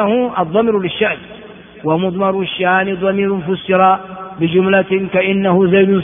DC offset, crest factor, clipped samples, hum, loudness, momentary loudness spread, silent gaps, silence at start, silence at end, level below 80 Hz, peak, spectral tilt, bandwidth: under 0.1%; 14 dB; under 0.1%; none; -15 LUFS; 7 LU; none; 0 s; 0 s; -52 dBFS; 0 dBFS; -4.5 dB/octave; 3.7 kHz